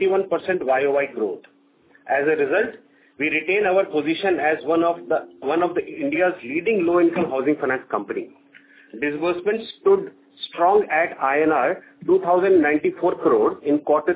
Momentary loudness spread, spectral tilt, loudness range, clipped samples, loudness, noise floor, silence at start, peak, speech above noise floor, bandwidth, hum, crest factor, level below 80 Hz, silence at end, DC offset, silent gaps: 9 LU; -9.5 dB/octave; 4 LU; under 0.1%; -21 LUFS; -56 dBFS; 0 s; -6 dBFS; 36 dB; 4 kHz; none; 16 dB; -64 dBFS; 0 s; under 0.1%; none